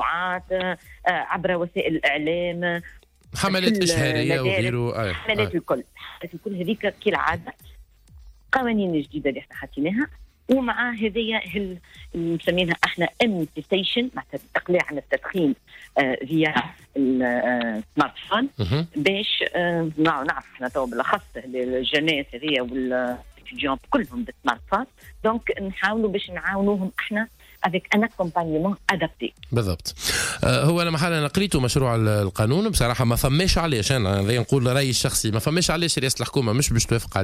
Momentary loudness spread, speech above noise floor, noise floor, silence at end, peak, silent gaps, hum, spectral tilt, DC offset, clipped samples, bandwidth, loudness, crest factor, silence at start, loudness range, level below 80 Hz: 8 LU; 25 dB; -48 dBFS; 0 s; -8 dBFS; none; none; -4.5 dB/octave; under 0.1%; under 0.1%; 16 kHz; -23 LUFS; 16 dB; 0 s; 5 LU; -42 dBFS